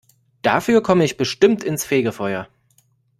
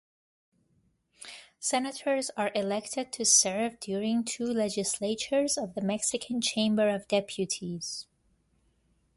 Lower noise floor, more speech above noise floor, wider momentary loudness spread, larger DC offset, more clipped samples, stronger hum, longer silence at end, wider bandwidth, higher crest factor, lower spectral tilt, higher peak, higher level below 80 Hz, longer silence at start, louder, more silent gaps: second, -60 dBFS vs -71 dBFS; about the same, 43 dB vs 42 dB; about the same, 9 LU vs 11 LU; neither; neither; neither; second, 0.75 s vs 1.15 s; first, 15.5 kHz vs 12 kHz; about the same, 18 dB vs 22 dB; first, -5 dB/octave vs -2.5 dB/octave; first, -2 dBFS vs -10 dBFS; first, -56 dBFS vs -70 dBFS; second, 0.45 s vs 1.2 s; first, -19 LUFS vs -29 LUFS; neither